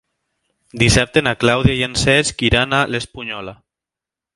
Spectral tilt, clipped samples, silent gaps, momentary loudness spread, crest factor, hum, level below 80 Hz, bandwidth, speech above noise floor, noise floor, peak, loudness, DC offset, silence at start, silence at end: -4 dB/octave; under 0.1%; none; 13 LU; 18 dB; none; -34 dBFS; 11.5 kHz; 71 dB; -88 dBFS; 0 dBFS; -16 LUFS; under 0.1%; 0.75 s; 0.8 s